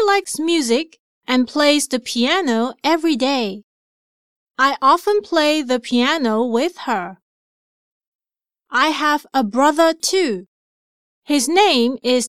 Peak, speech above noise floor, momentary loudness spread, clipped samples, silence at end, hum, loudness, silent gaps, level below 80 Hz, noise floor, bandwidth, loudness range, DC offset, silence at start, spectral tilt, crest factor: -2 dBFS; 70 dB; 8 LU; under 0.1%; 0 s; none; -17 LUFS; 0.99-1.21 s, 3.63-4.47 s, 7.22-8.01 s, 8.07-8.19 s, 10.48-11.22 s; -66 dBFS; -87 dBFS; 15.5 kHz; 4 LU; 0.3%; 0 s; -2.5 dB/octave; 16 dB